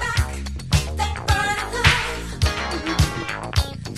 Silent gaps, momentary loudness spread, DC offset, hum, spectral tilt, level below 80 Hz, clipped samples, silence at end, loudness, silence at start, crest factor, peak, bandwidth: none; 9 LU; under 0.1%; none; -4 dB/octave; -28 dBFS; under 0.1%; 0 s; -22 LUFS; 0 s; 22 dB; 0 dBFS; 13 kHz